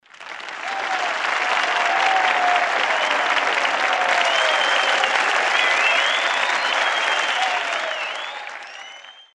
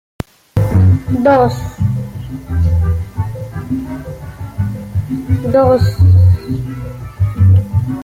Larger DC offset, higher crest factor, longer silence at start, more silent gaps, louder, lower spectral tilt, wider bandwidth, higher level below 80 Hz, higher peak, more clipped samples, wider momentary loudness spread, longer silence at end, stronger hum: neither; about the same, 16 dB vs 12 dB; second, 0.2 s vs 0.55 s; neither; second, -19 LUFS vs -14 LUFS; second, 1 dB/octave vs -9 dB/octave; first, 11.5 kHz vs 7.4 kHz; second, -68 dBFS vs -30 dBFS; about the same, -4 dBFS vs -2 dBFS; neither; second, 13 LU vs 16 LU; first, 0.15 s vs 0 s; neither